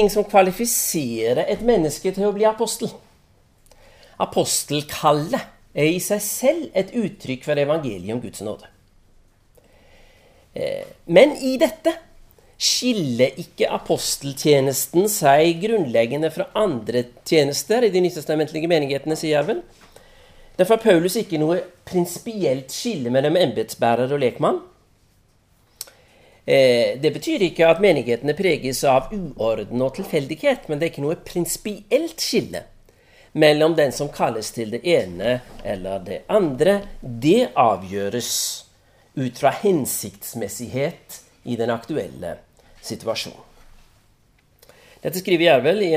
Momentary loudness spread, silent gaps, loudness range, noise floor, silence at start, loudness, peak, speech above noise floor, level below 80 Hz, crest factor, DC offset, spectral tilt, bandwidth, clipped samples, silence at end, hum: 13 LU; none; 7 LU; -58 dBFS; 0 s; -20 LUFS; 0 dBFS; 38 dB; -50 dBFS; 22 dB; under 0.1%; -4 dB/octave; 16 kHz; under 0.1%; 0 s; none